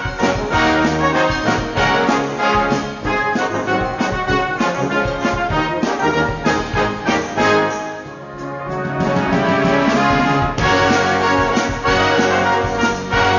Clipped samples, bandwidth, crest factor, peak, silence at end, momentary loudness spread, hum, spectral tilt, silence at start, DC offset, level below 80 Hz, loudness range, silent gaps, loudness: under 0.1%; 7.4 kHz; 12 dB; -4 dBFS; 0 s; 6 LU; none; -5 dB/octave; 0 s; under 0.1%; -34 dBFS; 3 LU; none; -17 LUFS